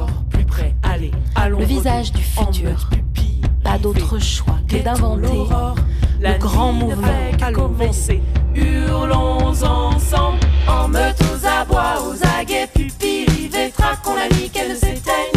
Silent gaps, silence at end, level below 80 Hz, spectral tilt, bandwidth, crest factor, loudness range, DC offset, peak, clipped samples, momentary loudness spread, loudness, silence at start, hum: none; 0 s; -18 dBFS; -5.5 dB/octave; 15.5 kHz; 12 dB; 2 LU; under 0.1%; -4 dBFS; under 0.1%; 4 LU; -18 LUFS; 0 s; none